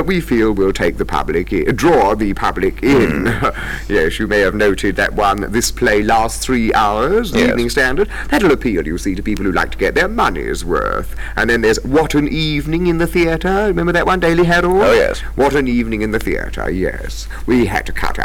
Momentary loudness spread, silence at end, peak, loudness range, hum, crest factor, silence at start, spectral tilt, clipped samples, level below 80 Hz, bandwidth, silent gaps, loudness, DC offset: 7 LU; 0 s; -6 dBFS; 2 LU; none; 10 dB; 0 s; -5 dB/octave; under 0.1%; -26 dBFS; 18 kHz; none; -15 LUFS; under 0.1%